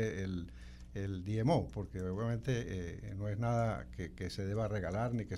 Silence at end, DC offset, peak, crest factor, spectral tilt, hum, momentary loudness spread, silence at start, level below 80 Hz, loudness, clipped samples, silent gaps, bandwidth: 0 s; under 0.1%; -20 dBFS; 16 dB; -7.5 dB/octave; none; 10 LU; 0 s; -52 dBFS; -38 LUFS; under 0.1%; none; 12 kHz